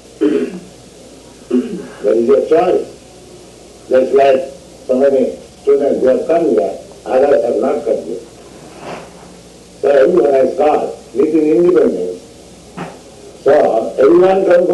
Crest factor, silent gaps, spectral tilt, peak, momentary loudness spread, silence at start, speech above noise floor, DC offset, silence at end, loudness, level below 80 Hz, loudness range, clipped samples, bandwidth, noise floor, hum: 10 dB; none; -6.5 dB/octave; -4 dBFS; 19 LU; 0.2 s; 27 dB; under 0.1%; 0 s; -13 LUFS; -50 dBFS; 4 LU; under 0.1%; 12 kHz; -38 dBFS; none